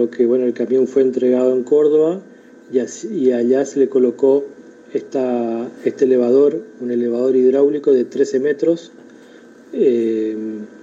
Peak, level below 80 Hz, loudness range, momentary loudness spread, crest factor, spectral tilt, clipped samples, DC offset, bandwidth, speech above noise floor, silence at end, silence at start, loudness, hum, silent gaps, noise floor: -4 dBFS; -72 dBFS; 2 LU; 10 LU; 14 dB; -6.5 dB/octave; under 0.1%; under 0.1%; 7.8 kHz; 27 dB; 0.15 s; 0 s; -17 LUFS; none; none; -43 dBFS